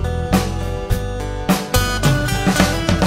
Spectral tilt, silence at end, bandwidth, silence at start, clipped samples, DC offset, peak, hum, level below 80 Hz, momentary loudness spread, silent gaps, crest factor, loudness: -5 dB/octave; 0 s; 16.5 kHz; 0 s; under 0.1%; under 0.1%; 0 dBFS; none; -26 dBFS; 8 LU; none; 18 dB; -18 LUFS